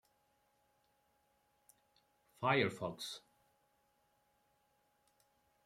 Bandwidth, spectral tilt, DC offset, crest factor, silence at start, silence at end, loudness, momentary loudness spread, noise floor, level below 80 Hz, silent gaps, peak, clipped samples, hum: 16 kHz; -5 dB/octave; under 0.1%; 26 dB; 2.4 s; 2.5 s; -38 LUFS; 13 LU; -78 dBFS; -82 dBFS; none; -20 dBFS; under 0.1%; none